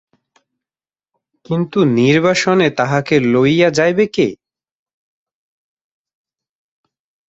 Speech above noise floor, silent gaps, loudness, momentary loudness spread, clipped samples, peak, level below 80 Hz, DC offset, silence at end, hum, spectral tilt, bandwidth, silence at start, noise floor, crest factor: over 77 dB; none; -14 LUFS; 6 LU; under 0.1%; -2 dBFS; -56 dBFS; under 0.1%; 2.95 s; none; -6 dB/octave; 8 kHz; 1.5 s; under -90 dBFS; 16 dB